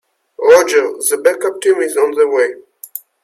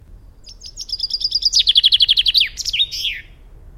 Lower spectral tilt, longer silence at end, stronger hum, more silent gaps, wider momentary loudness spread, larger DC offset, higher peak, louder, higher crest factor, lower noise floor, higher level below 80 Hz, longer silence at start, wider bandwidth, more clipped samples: first, -1.5 dB/octave vs 2 dB/octave; first, 0.25 s vs 0.05 s; neither; neither; first, 20 LU vs 17 LU; neither; about the same, 0 dBFS vs -2 dBFS; about the same, -13 LUFS vs -14 LUFS; about the same, 14 dB vs 18 dB; second, -33 dBFS vs -41 dBFS; second, -62 dBFS vs -40 dBFS; first, 0.4 s vs 0.1 s; about the same, 15.5 kHz vs 16.5 kHz; neither